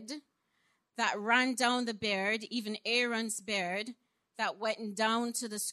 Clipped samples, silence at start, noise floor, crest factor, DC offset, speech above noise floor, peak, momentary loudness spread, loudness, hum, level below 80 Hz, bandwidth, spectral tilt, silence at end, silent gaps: under 0.1%; 0 s; -76 dBFS; 22 dB; under 0.1%; 43 dB; -12 dBFS; 11 LU; -32 LUFS; none; -80 dBFS; 13.5 kHz; -2 dB/octave; 0 s; none